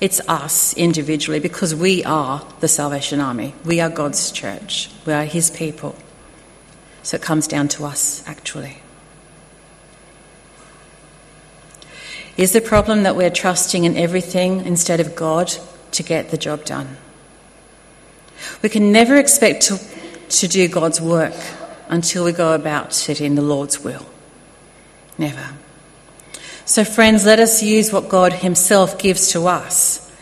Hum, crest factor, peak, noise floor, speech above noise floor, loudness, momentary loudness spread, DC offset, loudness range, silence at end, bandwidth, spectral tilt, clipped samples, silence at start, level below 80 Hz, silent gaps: none; 18 dB; 0 dBFS; -46 dBFS; 29 dB; -16 LUFS; 17 LU; under 0.1%; 10 LU; 0.15 s; 13 kHz; -3.5 dB/octave; under 0.1%; 0 s; -48 dBFS; none